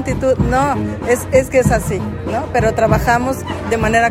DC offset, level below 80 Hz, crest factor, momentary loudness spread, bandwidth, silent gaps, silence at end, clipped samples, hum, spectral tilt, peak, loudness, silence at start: under 0.1%; -28 dBFS; 14 dB; 8 LU; 16.5 kHz; none; 0 s; under 0.1%; none; -6 dB/octave; -2 dBFS; -16 LUFS; 0 s